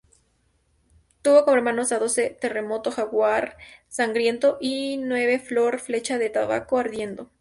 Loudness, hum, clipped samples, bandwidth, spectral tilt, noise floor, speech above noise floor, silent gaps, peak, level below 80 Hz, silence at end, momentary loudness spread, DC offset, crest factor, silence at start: -23 LUFS; none; under 0.1%; 11.5 kHz; -3 dB/octave; -66 dBFS; 44 dB; none; -6 dBFS; -62 dBFS; 0.15 s; 9 LU; under 0.1%; 18 dB; 1.25 s